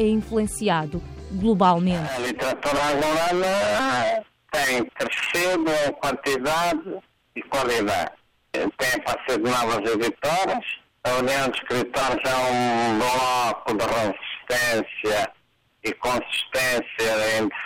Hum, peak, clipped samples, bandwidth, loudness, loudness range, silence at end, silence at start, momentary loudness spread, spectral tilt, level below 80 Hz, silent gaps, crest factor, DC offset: none; -8 dBFS; under 0.1%; 17 kHz; -23 LUFS; 3 LU; 0 s; 0 s; 7 LU; -4 dB/octave; -48 dBFS; none; 16 dB; under 0.1%